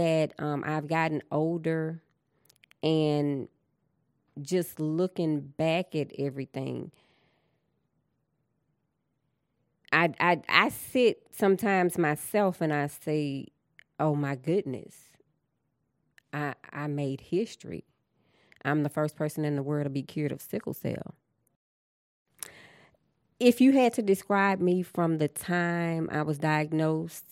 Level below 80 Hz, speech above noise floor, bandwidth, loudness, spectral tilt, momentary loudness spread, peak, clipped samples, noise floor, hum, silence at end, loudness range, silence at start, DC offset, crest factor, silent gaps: -72 dBFS; 50 dB; 16.5 kHz; -28 LUFS; -6 dB/octave; 13 LU; -2 dBFS; under 0.1%; -78 dBFS; none; 0.1 s; 10 LU; 0 s; under 0.1%; 26 dB; 21.56-22.25 s